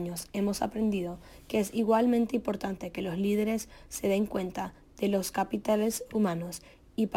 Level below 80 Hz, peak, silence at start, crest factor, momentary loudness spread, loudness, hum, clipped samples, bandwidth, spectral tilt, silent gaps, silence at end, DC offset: -56 dBFS; -14 dBFS; 0 s; 16 dB; 12 LU; -30 LUFS; none; under 0.1%; 17 kHz; -5.5 dB/octave; none; 0 s; under 0.1%